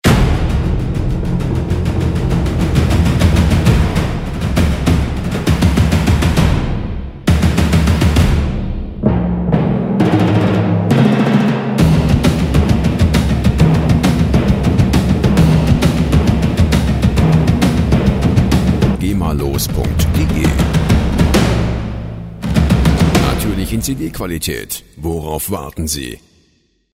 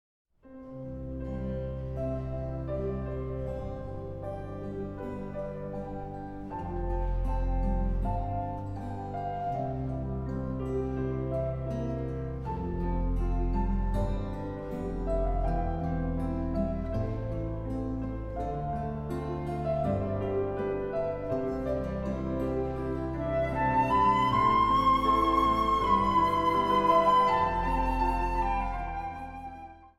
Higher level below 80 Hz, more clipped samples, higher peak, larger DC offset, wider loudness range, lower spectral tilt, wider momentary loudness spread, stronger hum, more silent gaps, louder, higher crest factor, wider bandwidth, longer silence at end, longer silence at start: first, -20 dBFS vs -36 dBFS; neither; first, 0 dBFS vs -12 dBFS; neither; second, 3 LU vs 11 LU; second, -6.5 dB/octave vs -8 dB/octave; second, 8 LU vs 14 LU; neither; neither; first, -14 LUFS vs -30 LUFS; second, 12 dB vs 18 dB; first, 16 kHz vs 11.5 kHz; first, 0.8 s vs 0.1 s; second, 0.05 s vs 0.45 s